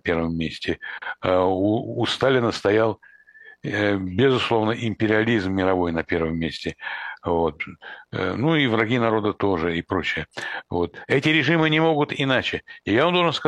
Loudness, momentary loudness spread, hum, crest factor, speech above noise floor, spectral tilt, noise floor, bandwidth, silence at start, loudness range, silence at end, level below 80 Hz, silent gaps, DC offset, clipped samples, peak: -22 LUFS; 11 LU; none; 18 dB; 27 dB; -6 dB/octave; -49 dBFS; 10.5 kHz; 0.05 s; 2 LU; 0 s; -50 dBFS; none; under 0.1%; under 0.1%; -4 dBFS